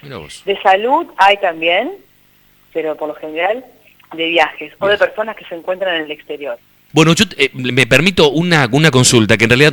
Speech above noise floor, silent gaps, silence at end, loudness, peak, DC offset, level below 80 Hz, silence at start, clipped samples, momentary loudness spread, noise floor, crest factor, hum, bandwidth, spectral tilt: 37 dB; none; 0 s; -13 LUFS; 0 dBFS; under 0.1%; -46 dBFS; 0.05 s; under 0.1%; 16 LU; -51 dBFS; 14 dB; 50 Hz at -60 dBFS; over 20 kHz; -4 dB/octave